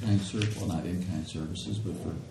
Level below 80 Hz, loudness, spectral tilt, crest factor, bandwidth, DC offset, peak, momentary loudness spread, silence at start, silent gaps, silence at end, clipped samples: -52 dBFS; -33 LUFS; -6 dB/octave; 18 dB; 12.5 kHz; under 0.1%; -12 dBFS; 7 LU; 0 s; none; 0 s; under 0.1%